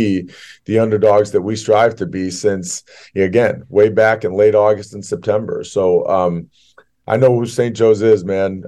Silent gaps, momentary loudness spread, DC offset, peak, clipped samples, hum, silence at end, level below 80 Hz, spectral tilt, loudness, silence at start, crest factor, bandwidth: none; 10 LU; under 0.1%; -2 dBFS; under 0.1%; none; 0 s; -56 dBFS; -6 dB/octave; -15 LUFS; 0 s; 14 dB; 12 kHz